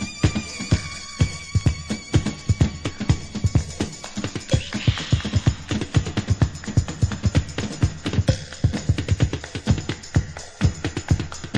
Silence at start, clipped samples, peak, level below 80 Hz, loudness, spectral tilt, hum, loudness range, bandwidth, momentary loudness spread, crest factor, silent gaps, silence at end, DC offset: 0 s; under 0.1%; -4 dBFS; -32 dBFS; -24 LUFS; -5.5 dB/octave; none; 1 LU; 11 kHz; 7 LU; 20 dB; none; 0 s; under 0.1%